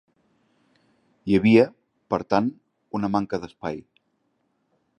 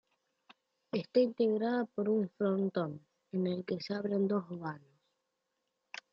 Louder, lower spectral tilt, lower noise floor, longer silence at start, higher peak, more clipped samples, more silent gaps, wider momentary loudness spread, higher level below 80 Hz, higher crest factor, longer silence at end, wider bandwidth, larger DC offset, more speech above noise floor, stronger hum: first, -23 LUFS vs -34 LUFS; about the same, -8 dB/octave vs -8 dB/octave; second, -71 dBFS vs -84 dBFS; first, 1.25 s vs 0.95 s; first, -4 dBFS vs -16 dBFS; neither; neither; first, 16 LU vs 13 LU; first, -58 dBFS vs -82 dBFS; about the same, 22 dB vs 18 dB; second, 1.2 s vs 1.35 s; first, 9 kHz vs 7.2 kHz; neither; about the same, 50 dB vs 51 dB; neither